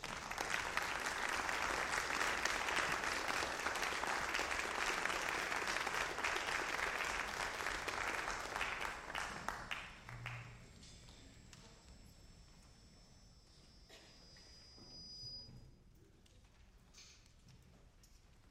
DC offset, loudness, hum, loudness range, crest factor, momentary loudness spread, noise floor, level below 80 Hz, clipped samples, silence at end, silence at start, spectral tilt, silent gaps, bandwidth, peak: under 0.1%; -40 LUFS; none; 22 LU; 26 dB; 22 LU; -65 dBFS; -62 dBFS; under 0.1%; 0 s; 0 s; -1.5 dB/octave; none; 16 kHz; -16 dBFS